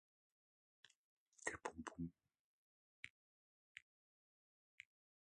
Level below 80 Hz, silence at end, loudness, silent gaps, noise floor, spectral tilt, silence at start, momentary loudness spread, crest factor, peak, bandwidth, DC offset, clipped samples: -76 dBFS; 1.45 s; -53 LUFS; 0.96-1.32 s, 2.39-3.03 s, 3.10-3.75 s; under -90 dBFS; -4 dB/octave; 0.85 s; 15 LU; 32 dB; -26 dBFS; 10 kHz; under 0.1%; under 0.1%